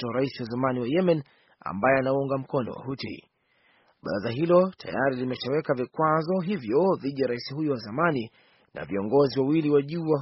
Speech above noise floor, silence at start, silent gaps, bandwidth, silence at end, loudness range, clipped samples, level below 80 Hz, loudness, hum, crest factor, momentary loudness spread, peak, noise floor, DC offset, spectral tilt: 40 dB; 0 s; none; 6 kHz; 0 s; 3 LU; under 0.1%; -64 dBFS; -26 LUFS; none; 18 dB; 12 LU; -8 dBFS; -65 dBFS; under 0.1%; -5.5 dB/octave